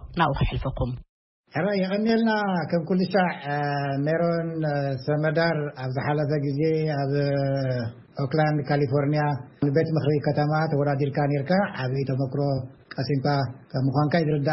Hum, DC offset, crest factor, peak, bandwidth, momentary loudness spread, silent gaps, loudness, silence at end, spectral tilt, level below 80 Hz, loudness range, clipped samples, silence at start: none; under 0.1%; 16 dB; -8 dBFS; 5.8 kHz; 6 LU; 1.09-1.44 s; -25 LUFS; 0 s; -11 dB/octave; -46 dBFS; 1 LU; under 0.1%; 0 s